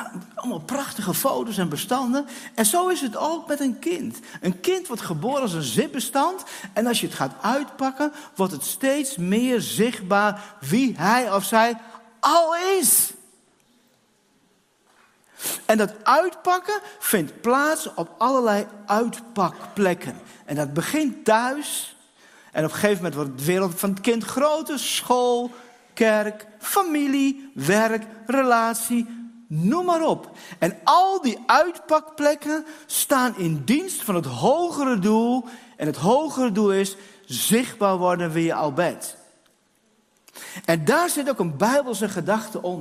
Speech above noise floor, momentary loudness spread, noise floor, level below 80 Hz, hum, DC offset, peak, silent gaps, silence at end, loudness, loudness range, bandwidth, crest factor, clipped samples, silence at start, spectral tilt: 41 dB; 10 LU; -63 dBFS; -68 dBFS; none; under 0.1%; -2 dBFS; none; 0 s; -22 LUFS; 4 LU; 16 kHz; 22 dB; under 0.1%; 0 s; -4 dB/octave